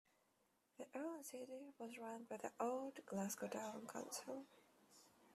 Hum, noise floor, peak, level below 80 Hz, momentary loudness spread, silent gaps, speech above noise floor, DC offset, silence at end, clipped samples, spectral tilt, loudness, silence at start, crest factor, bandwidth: none; -82 dBFS; -30 dBFS; under -90 dBFS; 19 LU; none; 33 dB; under 0.1%; 0 s; under 0.1%; -4 dB/octave; -50 LUFS; 0.8 s; 22 dB; 14 kHz